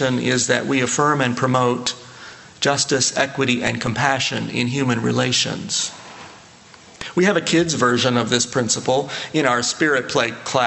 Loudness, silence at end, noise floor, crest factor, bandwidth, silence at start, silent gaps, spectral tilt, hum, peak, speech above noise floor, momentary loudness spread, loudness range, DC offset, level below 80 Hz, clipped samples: -19 LUFS; 0 s; -45 dBFS; 18 dB; 9.4 kHz; 0 s; none; -3.5 dB/octave; none; -2 dBFS; 26 dB; 8 LU; 3 LU; under 0.1%; -56 dBFS; under 0.1%